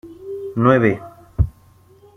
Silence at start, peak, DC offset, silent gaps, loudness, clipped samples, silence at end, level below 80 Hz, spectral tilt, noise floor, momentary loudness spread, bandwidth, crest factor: 0.05 s; -2 dBFS; under 0.1%; none; -19 LUFS; under 0.1%; 0.65 s; -32 dBFS; -9.5 dB/octave; -50 dBFS; 18 LU; 6.6 kHz; 18 dB